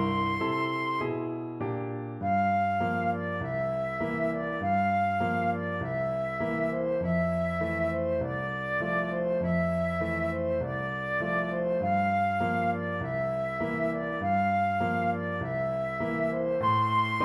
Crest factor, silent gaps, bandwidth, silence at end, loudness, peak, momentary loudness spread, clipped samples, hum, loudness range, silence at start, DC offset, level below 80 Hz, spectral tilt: 14 dB; none; 11.5 kHz; 0 s; -29 LUFS; -16 dBFS; 5 LU; under 0.1%; none; 1 LU; 0 s; under 0.1%; -54 dBFS; -8 dB/octave